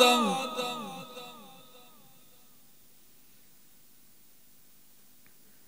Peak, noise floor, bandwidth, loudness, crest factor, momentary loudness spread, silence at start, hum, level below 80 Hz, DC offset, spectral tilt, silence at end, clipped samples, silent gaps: -6 dBFS; -61 dBFS; 16 kHz; -30 LUFS; 28 dB; 29 LU; 0 s; 50 Hz at -75 dBFS; -80 dBFS; 0.2%; -2.5 dB/octave; 4.2 s; under 0.1%; none